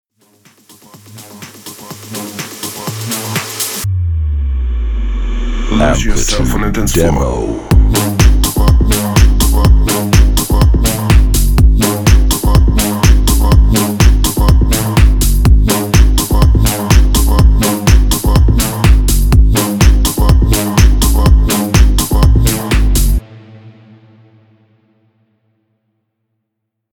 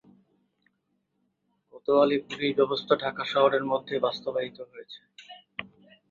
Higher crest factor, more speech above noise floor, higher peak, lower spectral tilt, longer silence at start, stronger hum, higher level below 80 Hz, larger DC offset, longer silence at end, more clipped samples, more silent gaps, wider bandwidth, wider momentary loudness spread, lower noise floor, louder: second, 10 dB vs 22 dB; first, 62 dB vs 49 dB; first, 0 dBFS vs -6 dBFS; about the same, -5 dB/octave vs -6 dB/octave; second, 1.1 s vs 1.75 s; neither; first, -12 dBFS vs -72 dBFS; neither; first, 3.25 s vs 0.45 s; first, 0.3% vs under 0.1%; neither; first, 19.5 kHz vs 7.6 kHz; second, 9 LU vs 22 LU; about the same, -73 dBFS vs -76 dBFS; first, -12 LUFS vs -26 LUFS